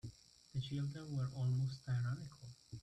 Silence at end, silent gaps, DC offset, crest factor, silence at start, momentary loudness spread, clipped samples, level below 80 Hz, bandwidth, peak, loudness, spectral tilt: 0 s; none; under 0.1%; 12 dB; 0.05 s; 16 LU; under 0.1%; -68 dBFS; 9.6 kHz; -30 dBFS; -42 LUFS; -7 dB/octave